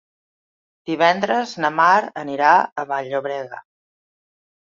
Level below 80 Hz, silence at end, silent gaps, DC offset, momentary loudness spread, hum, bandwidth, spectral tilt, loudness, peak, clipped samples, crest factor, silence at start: -70 dBFS; 1.05 s; 2.72-2.76 s; under 0.1%; 14 LU; none; 7.6 kHz; -4.5 dB/octave; -19 LUFS; -2 dBFS; under 0.1%; 20 dB; 0.85 s